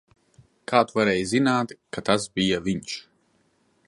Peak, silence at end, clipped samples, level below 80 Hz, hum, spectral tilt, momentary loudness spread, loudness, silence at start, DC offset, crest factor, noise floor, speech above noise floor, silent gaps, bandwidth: -4 dBFS; 0.9 s; under 0.1%; -56 dBFS; none; -4.5 dB/octave; 12 LU; -24 LUFS; 0.7 s; under 0.1%; 22 dB; -66 dBFS; 43 dB; none; 11.5 kHz